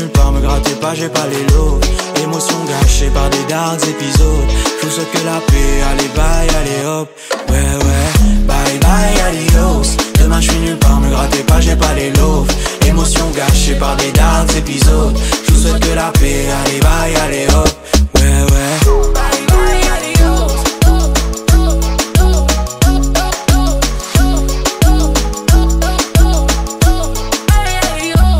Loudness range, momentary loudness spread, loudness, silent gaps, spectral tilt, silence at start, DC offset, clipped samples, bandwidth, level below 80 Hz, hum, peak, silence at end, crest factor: 2 LU; 4 LU; -13 LUFS; none; -4.5 dB/octave; 0 s; under 0.1%; under 0.1%; 16.5 kHz; -12 dBFS; none; 0 dBFS; 0 s; 10 dB